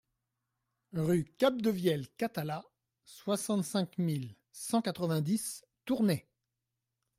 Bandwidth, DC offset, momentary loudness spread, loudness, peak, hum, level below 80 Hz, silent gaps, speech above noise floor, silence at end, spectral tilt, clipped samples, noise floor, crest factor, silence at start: 16 kHz; under 0.1%; 12 LU; -33 LUFS; -14 dBFS; none; -72 dBFS; none; 55 dB; 1 s; -5.5 dB/octave; under 0.1%; -87 dBFS; 20 dB; 0.95 s